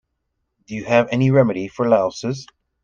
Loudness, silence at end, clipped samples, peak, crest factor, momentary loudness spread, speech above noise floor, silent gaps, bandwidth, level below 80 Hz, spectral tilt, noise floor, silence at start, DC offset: -18 LUFS; 0.4 s; under 0.1%; -2 dBFS; 18 dB; 15 LU; 56 dB; none; 7.4 kHz; -56 dBFS; -7 dB/octave; -74 dBFS; 0.7 s; under 0.1%